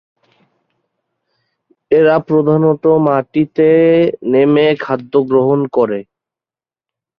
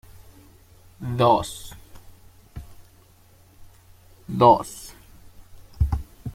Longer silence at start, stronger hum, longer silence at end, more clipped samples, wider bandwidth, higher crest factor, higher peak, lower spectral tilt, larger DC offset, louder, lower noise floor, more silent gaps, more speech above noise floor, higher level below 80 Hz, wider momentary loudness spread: first, 1.9 s vs 1 s; neither; first, 1.15 s vs 0.05 s; neither; second, 5.2 kHz vs 16.5 kHz; second, 12 dB vs 24 dB; about the same, -2 dBFS vs -4 dBFS; first, -10 dB/octave vs -6.5 dB/octave; neither; first, -13 LUFS vs -21 LUFS; first, under -90 dBFS vs -54 dBFS; neither; first, over 78 dB vs 34 dB; second, -58 dBFS vs -38 dBFS; second, 6 LU vs 27 LU